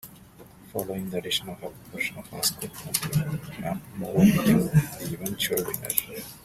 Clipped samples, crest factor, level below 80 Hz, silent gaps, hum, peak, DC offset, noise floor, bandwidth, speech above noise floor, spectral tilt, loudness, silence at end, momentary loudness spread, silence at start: under 0.1%; 26 dB; -54 dBFS; none; none; 0 dBFS; under 0.1%; -49 dBFS; 16 kHz; 23 dB; -4.5 dB/octave; -26 LUFS; 0.05 s; 15 LU; 0.05 s